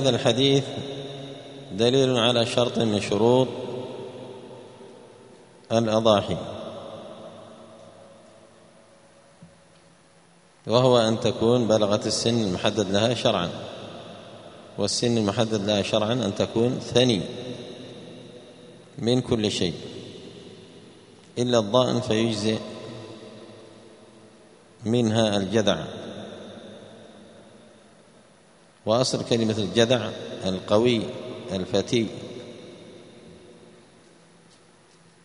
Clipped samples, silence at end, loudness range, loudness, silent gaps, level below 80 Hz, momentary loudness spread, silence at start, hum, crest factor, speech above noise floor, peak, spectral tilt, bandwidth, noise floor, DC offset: under 0.1%; 1.7 s; 8 LU; -23 LUFS; none; -60 dBFS; 23 LU; 0 s; none; 22 dB; 34 dB; -4 dBFS; -5 dB/octave; 10.5 kHz; -56 dBFS; under 0.1%